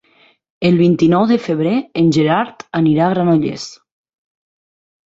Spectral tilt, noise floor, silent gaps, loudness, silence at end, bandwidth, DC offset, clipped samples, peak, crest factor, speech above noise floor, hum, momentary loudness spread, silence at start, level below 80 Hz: -7.5 dB/octave; -53 dBFS; none; -15 LUFS; 1.4 s; 7.8 kHz; under 0.1%; under 0.1%; -2 dBFS; 14 dB; 39 dB; none; 9 LU; 0.6 s; -54 dBFS